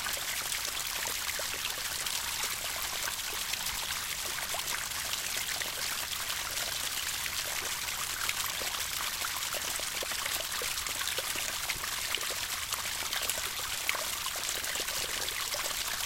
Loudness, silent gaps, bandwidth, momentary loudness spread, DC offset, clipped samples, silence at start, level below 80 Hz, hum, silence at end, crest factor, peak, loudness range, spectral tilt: -32 LUFS; none; 17 kHz; 1 LU; under 0.1%; under 0.1%; 0 s; -56 dBFS; none; 0 s; 26 dB; -10 dBFS; 1 LU; 0.5 dB/octave